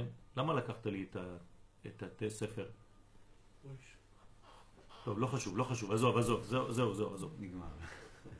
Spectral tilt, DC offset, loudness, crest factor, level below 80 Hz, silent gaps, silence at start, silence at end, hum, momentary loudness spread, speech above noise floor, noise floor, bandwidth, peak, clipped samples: -6 dB/octave; under 0.1%; -38 LUFS; 22 dB; -60 dBFS; none; 0 s; 0 s; none; 20 LU; 23 dB; -61 dBFS; 11 kHz; -18 dBFS; under 0.1%